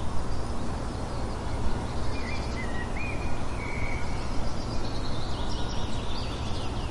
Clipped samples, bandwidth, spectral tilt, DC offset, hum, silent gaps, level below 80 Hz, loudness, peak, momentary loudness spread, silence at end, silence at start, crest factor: under 0.1%; 11.5 kHz; -5.5 dB/octave; under 0.1%; none; none; -34 dBFS; -33 LUFS; -14 dBFS; 1 LU; 0 s; 0 s; 14 dB